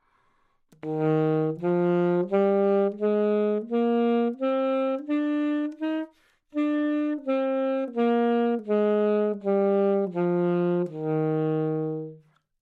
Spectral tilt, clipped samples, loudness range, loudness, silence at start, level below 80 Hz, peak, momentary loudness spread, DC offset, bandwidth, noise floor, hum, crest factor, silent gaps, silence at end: -10 dB/octave; under 0.1%; 3 LU; -25 LUFS; 0.85 s; -76 dBFS; -12 dBFS; 6 LU; under 0.1%; 4.8 kHz; -67 dBFS; none; 14 dB; none; 0.45 s